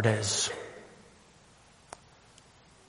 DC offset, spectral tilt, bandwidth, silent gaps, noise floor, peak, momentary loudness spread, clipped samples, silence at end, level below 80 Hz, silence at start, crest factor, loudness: under 0.1%; -3.5 dB/octave; 11.5 kHz; none; -59 dBFS; -10 dBFS; 24 LU; under 0.1%; 1.95 s; -66 dBFS; 0 s; 24 dB; -30 LUFS